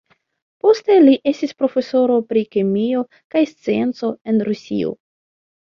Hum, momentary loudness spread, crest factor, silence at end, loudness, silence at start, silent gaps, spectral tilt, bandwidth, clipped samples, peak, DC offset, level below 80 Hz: none; 11 LU; 16 dB; 0.85 s; -18 LUFS; 0.65 s; 3.24-3.30 s, 4.21-4.25 s; -7 dB/octave; 7.2 kHz; under 0.1%; -2 dBFS; under 0.1%; -62 dBFS